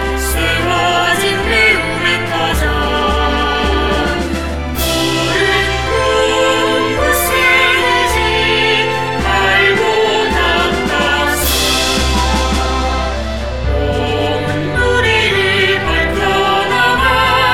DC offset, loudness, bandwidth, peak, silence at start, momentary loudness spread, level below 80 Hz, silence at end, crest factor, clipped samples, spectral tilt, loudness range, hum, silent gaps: 2%; -13 LUFS; 16.5 kHz; 0 dBFS; 0 s; 6 LU; -24 dBFS; 0 s; 12 dB; under 0.1%; -3.5 dB/octave; 3 LU; none; none